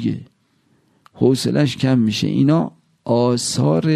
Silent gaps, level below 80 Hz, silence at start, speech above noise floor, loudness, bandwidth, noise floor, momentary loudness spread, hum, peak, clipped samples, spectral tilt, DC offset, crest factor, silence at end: none; -56 dBFS; 0 s; 44 dB; -18 LUFS; 13.5 kHz; -61 dBFS; 9 LU; none; -2 dBFS; under 0.1%; -6 dB/octave; under 0.1%; 16 dB; 0 s